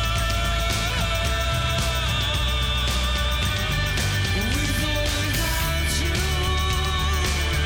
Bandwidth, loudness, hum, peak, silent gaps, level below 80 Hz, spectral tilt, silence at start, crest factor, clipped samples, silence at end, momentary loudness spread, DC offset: 17.5 kHz; -23 LUFS; none; -10 dBFS; none; -26 dBFS; -3.5 dB/octave; 0 s; 12 dB; under 0.1%; 0 s; 1 LU; under 0.1%